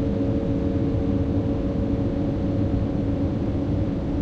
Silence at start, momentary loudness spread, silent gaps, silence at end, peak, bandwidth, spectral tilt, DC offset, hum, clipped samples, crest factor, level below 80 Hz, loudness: 0 s; 1 LU; none; 0 s; -12 dBFS; 6.8 kHz; -10 dB/octave; under 0.1%; none; under 0.1%; 12 dB; -32 dBFS; -24 LUFS